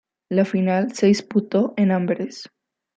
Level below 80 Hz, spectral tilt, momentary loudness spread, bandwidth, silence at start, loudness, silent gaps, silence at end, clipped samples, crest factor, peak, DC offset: -68 dBFS; -7 dB/octave; 8 LU; 8.4 kHz; 0.3 s; -21 LUFS; none; 0.5 s; under 0.1%; 16 dB; -6 dBFS; under 0.1%